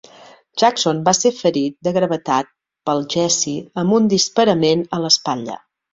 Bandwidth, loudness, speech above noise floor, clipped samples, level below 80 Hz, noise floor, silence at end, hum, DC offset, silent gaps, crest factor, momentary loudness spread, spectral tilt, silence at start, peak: 8 kHz; -17 LUFS; 28 dB; under 0.1%; -60 dBFS; -45 dBFS; 0.4 s; none; under 0.1%; none; 16 dB; 10 LU; -3.5 dB/octave; 0.55 s; -2 dBFS